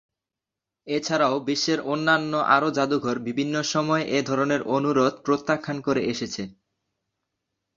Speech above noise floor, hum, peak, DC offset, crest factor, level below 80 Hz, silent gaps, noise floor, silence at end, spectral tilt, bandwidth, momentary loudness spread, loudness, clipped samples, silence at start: 64 dB; none; -4 dBFS; under 0.1%; 22 dB; -64 dBFS; none; -87 dBFS; 1.25 s; -4.5 dB/octave; 7.6 kHz; 8 LU; -24 LUFS; under 0.1%; 0.85 s